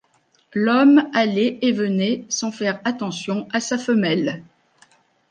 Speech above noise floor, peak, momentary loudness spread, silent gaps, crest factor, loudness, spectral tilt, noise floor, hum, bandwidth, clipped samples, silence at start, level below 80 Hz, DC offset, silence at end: 42 dB; -4 dBFS; 12 LU; none; 16 dB; -20 LUFS; -4.5 dB/octave; -62 dBFS; none; 9.8 kHz; under 0.1%; 0.55 s; -68 dBFS; under 0.1%; 0.9 s